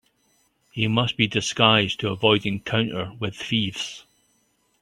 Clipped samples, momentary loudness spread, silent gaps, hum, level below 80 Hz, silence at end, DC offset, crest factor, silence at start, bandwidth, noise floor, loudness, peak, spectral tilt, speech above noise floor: under 0.1%; 14 LU; none; none; -58 dBFS; 0.8 s; under 0.1%; 22 dB; 0.75 s; 12.5 kHz; -67 dBFS; -22 LUFS; -2 dBFS; -4.5 dB/octave; 44 dB